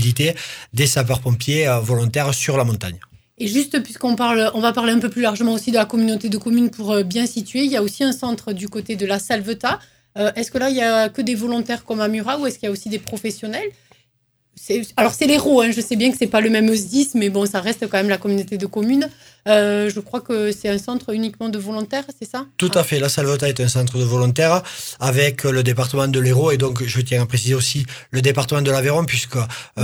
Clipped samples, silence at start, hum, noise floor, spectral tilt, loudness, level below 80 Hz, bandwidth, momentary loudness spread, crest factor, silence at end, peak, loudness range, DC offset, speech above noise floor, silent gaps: under 0.1%; 0 s; none; -66 dBFS; -5 dB/octave; -19 LUFS; -52 dBFS; 19.5 kHz; 10 LU; 18 dB; 0 s; 0 dBFS; 4 LU; under 0.1%; 47 dB; none